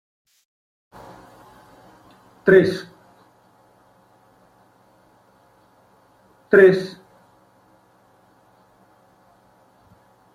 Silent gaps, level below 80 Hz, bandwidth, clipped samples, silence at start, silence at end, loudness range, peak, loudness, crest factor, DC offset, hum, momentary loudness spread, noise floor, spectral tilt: none; -64 dBFS; 9.8 kHz; under 0.1%; 2.45 s; 3.45 s; 2 LU; -2 dBFS; -16 LUFS; 22 dB; under 0.1%; none; 31 LU; -57 dBFS; -7 dB/octave